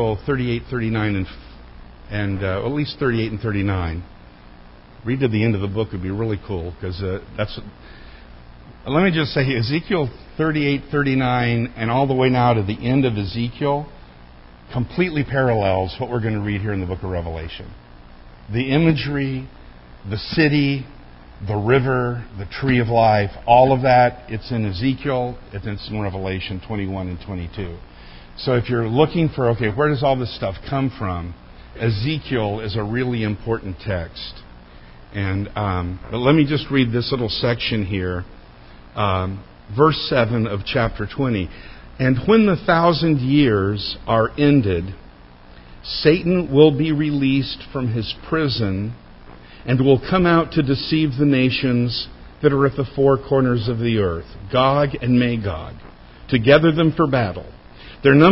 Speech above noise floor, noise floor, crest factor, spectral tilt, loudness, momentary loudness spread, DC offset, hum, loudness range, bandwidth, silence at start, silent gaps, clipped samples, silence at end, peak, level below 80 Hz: 24 dB; -43 dBFS; 20 dB; -11 dB/octave; -20 LUFS; 14 LU; under 0.1%; none; 7 LU; 5.8 kHz; 0 s; none; under 0.1%; 0 s; 0 dBFS; -38 dBFS